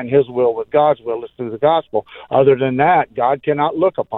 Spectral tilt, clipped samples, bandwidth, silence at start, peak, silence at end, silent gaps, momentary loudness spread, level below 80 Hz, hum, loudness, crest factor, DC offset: -10 dB/octave; under 0.1%; 4.1 kHz; 0 s; -2 dBFS; 0 s; none; 10 LU; -56 dBFS; none; -16 LUFS; 14 dB; under 0.1%